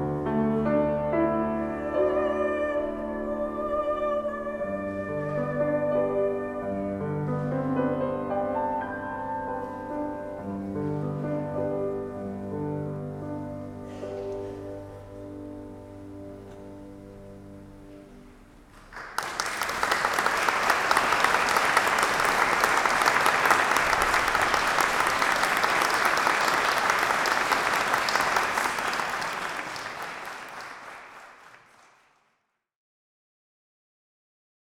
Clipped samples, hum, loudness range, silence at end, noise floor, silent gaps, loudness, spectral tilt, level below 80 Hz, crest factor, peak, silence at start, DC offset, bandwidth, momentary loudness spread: under 0.1%; none; 18 LU; 3.1 s; -75 dBFS; none; -26 LUFS; -3.5 dB/octave; -52 dBFS; 26 dB; -2 dBFS; 0 s; under 0.1%; 18 kHz; 19 LU